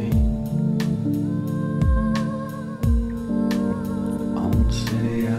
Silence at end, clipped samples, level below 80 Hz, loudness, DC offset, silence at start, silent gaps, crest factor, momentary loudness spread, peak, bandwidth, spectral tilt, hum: 0 s; under 0.1%; -28 dBFS; -23 LUFS; under 0.1%; 0 s; none; 14 dB; 5 LU; -8 dBFS; 15.5 kHz; -7.5 dB/octave; none